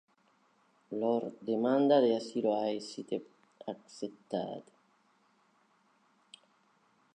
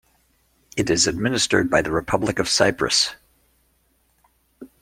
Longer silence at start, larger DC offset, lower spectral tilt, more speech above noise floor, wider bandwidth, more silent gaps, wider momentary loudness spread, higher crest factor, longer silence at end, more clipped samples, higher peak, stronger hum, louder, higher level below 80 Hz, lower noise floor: first, 0.9 s vs 0.75 s; neither; first, -6 dB/octave vs -3 dB/octave; second, 38 dB vs 44 dB; second, 9.8 kHz vs 16.5 kHz; neither; first, 18 LU vs 5 LU; about the same, 22 dB vs 22 dB; first, 2.55 s vs 0.15 s; neither; second, -14 dBFS vs -2 dBFS; neither; second, -33 LUFS vs -20 LUFS; second, -88 dBFS vs -48 dBFS; first, -70 dBFS vs -64 dBFS